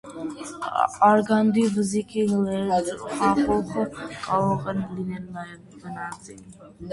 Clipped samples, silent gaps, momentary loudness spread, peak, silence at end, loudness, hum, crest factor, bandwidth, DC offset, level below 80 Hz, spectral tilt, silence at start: under 0.1%; none; 19 LU; -6 dBFS; 0 s; -24 LUFS; none; 20 dB; 11.5 kHz; under 0.1%; -54 dBFS; -6 dB/octave; 0.05 s